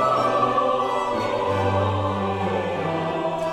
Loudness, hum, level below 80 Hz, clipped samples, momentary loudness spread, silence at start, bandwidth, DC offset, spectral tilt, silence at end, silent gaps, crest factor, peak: -23 LUFS; none; -54 dBFS; under 0.1%; 5 LU; 0 s; 12.5 kHz; under 0.1%; -6.5 dB/octave; 0 s; none; 14 dB; -8 dBFS